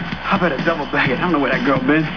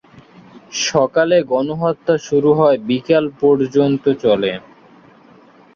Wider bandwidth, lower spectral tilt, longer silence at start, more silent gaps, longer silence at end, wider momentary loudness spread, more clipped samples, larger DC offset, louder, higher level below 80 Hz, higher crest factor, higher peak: second, 5.4 kHz vs 7.4 kHz; first, -7 dB/octave vs -5 dB/octave; second, 0 s vs 0.55 s; neither; second, 0 s vs 1.15 s; second, 3 LU vs 6 LU; neither; first, 1% vs under 0.1%; about the same, -17 LUFS vs -16 LUFS; first, -42 dBFS vs -56 dBFS; about the same, 16 dB vs 14 dB; about the same, -2 dBFS vs -2 dBFS